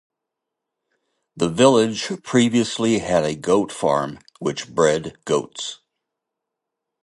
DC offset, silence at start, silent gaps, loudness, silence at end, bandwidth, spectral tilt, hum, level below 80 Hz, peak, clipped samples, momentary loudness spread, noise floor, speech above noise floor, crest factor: under 0.1%; 1.35 s; none; -20 LUFS; 1.3 s; 11.5 kHz; -4.5 dB/octave; none; -56 dBFS; -2 dBFS; under 0.1%; 12 LU; -83 dBFS; 63 dB; 20 dB